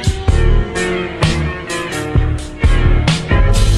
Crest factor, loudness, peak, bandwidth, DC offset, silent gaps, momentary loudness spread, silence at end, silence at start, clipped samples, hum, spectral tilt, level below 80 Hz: 12 dB; -16 LUFS; -2 dBFS; 12.5 kHz; under 0.1%; none; 6 LU; 0 s; 0 s; under 0.1%; none; -5.5 dB/octave; -16 dBFS